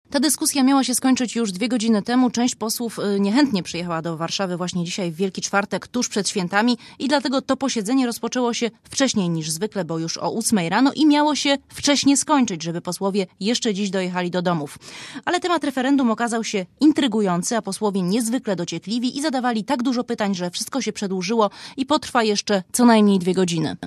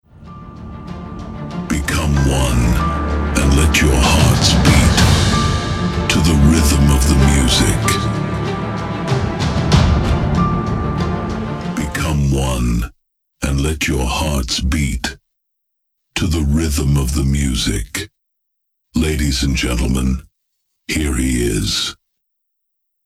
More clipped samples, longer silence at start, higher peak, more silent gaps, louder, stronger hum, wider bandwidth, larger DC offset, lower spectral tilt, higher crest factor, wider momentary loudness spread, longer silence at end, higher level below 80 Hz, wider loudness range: neither; about the same, 0.1 s vs 0.2 s; second, -4 dBFS vs 0 dBFS; neither; second, -21 LUFS vs -16 LUFS; neither; about the same, 14.5 kHz vs 15.5 kHz; neither; about the same, -4 dB/octave vs -5 dB/octave; about the same, 18 dB vs 16 dB; second, 8 LU vs 13 LU; second, 0 s vs 1.1 s; second, -62 dBFS vs -22 dBFS; second, 4 LU vs 7 LU